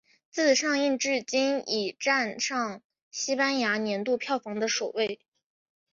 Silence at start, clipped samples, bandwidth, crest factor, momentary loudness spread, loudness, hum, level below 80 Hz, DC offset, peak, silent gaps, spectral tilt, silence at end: 0.35 s; under 0.1%; 7.6 kHz; 18 dB; 9 LU; -27 LUFS; none; -76 dBFS; under 0.1%; -10 dBFS; 2.84-2.90 s, 3.02-3.11 s; -2 dB/octave; 0.8 s